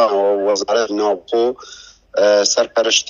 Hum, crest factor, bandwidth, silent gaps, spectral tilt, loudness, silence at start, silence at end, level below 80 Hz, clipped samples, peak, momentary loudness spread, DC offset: none; 16 dB; 7.6 kHz; none; -1 dB/octave; -16 LUFS; 0 s; 0 s; -60 dBFS; under 0.1%; -2 dBFS; 10 LU; under 0.1%